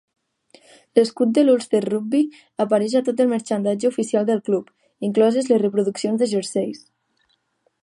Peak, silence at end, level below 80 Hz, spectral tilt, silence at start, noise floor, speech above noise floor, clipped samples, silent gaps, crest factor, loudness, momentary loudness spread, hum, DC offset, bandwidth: -2 dBFS; 1.05 s; -74 dBFS; -6 dB/octave; 0.95 s; -67 dBFS; 48 dB; under 0.1%; none; 20 dB; -20 LUFS; 8 LU; none; under 0.1%; 11.5 kHz